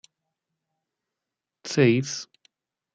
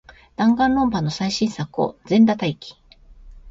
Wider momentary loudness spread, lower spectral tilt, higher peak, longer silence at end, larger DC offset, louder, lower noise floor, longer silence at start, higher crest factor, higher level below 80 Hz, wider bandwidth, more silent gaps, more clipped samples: first, 21 LU vs 13 LU; about the same, -5.5 dB/octave vs -6 dB/octave; about the same, -6 dBFS vs -6 dBFS; first, 0.7 s vs 0 s; neither; second, -23 LUFS vs -20 LUFS; first, -87 dBFS vs -45 dBFS; first, 1.65 s vs 0.4 s; first, 22 dB vs 16 dB; second, -74 dBFS vs -48 dBFS; first, 9.2 kHz vs 7.8 kHz; neither; neither